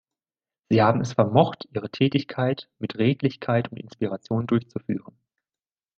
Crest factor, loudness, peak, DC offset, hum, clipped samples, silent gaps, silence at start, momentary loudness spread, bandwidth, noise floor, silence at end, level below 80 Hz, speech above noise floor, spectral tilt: 22 dB; -24 LUFS; -2 dBFS; under 0.1%; none; under 0.1%; none; 0.7 s; 12 LU; 7.2 kHz; under -90 dBFS; 1 s; -62 dBFS; over 66 dB; -7.5 dB/octave